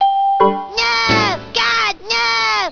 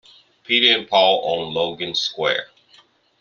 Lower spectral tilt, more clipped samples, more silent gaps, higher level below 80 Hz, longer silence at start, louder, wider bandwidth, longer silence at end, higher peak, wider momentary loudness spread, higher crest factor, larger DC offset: about the same, -3 dB/octave vs -3 dB/octave; neither; neither; first, -44 dBFS vs -64 dBFS; second, 0 s vs 0.5 s; first, -14 LUFS vs -18 LUFS; second, 5.4 kHz vs 7.4 kHz; second, 0 s vs 0.75 s; about the same, 0 dBFS vs -2 dBFS; second, 3 LU vs 9 LU; about the same, 16 dB vs 20 dB; neither